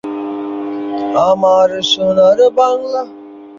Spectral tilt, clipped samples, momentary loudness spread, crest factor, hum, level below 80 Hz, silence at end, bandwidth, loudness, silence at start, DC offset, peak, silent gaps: -4.5 dB/octave; under 0.1%; 12 LU; 12 dB; none; -54 dBFS; 0 s; 7.6 kHz; -13 LUFS; 0.05 s; under 0.1%; -2 dBFS; none